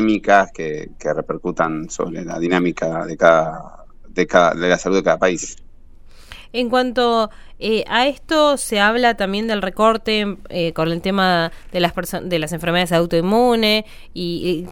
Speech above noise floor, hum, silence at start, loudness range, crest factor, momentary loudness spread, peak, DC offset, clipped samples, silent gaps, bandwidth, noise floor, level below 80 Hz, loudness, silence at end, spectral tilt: 22 dB; none; 0 s; 2 LU; 18 dB; 11 LU; 0 dBFS; under 0.1%; under 0.1%; none; 16.5 kHz; -40 dBFS; -40 dBFS; -18 LUFS; 0 s; -4.5 dB/octave